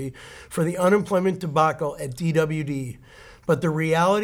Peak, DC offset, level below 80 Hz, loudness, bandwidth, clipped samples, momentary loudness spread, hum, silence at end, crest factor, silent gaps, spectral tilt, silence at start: -6 dBFS; under 0.1%; -54 dBFS; -23 LUFS; 17 kHz; under 0.1%; 15 LU; none; 0 s; 16 dB; none; -6.5 dB/octave; 0 s